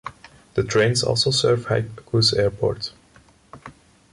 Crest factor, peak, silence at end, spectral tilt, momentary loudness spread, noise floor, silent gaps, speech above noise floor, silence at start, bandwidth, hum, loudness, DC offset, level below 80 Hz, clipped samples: 16 dB; -6 dBFS; 0.4 s; -4.5 dB/octave; 11 LU; -53 dBFS; none; 33 dB; 0.05 s; 11.5 kHz; none; -21 LUFS; under 0.1%; -48 dBFS; under 0.1%